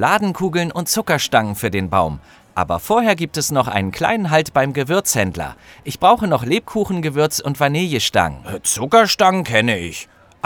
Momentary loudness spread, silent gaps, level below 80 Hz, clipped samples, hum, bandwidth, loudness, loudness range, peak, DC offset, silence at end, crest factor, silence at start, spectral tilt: 9 LU; none; -46 dBFS; under 0.1%; none; over 20 kHz; -17 LUFS; 2 LU; 0 dBFS; under 0.1%; 0.4 s; 18 dB; 0 s; -4 dB/octave